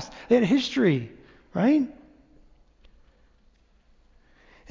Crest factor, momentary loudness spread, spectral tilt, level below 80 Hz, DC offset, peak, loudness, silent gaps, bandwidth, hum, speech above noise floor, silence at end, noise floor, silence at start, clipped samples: 18 dB; 13 LU; -6.5 dB/octave; -60 dBFS; under 0.1%; -8 dBFS; -24 LUFS; none; 7.6 kHz; none; 39 dB; 2.8 s; -61 dBFS; 0 s; under 0.1%